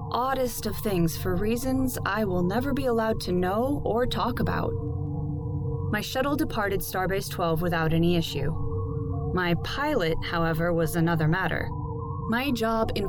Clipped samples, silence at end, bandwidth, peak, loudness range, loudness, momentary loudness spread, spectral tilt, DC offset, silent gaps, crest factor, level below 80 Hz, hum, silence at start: under 0.1%; 0 s; over 20 kHz; -12 dBFS; 2 LU; -27 LUFS; 6 LU; -6 dB/octave; under 0.1%; none; 14 dB; -38 dBFS; none; 0 s